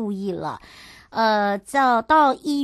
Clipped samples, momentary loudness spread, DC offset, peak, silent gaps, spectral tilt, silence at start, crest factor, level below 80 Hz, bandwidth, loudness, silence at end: under 0.1%; 14 LU; under 0.1%; -6 dBFS; none; -5 dB/octave; 0 s; 16 dB; -56 dBFS; 12.5 kHz; -20 LUFS; 0 s